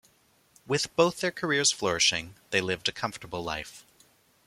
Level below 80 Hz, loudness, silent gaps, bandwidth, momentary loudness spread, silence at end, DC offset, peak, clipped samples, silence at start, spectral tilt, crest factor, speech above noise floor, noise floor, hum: -60 dBFS; -27 LUFS; none; 16 kHz; 11 LU; 0.65 s; under 0.1%; -6 dBFS; under 0.1%; 0.65 s; -2.5 dB/octave; 24 dB; 36 dB; -65 dBFS; none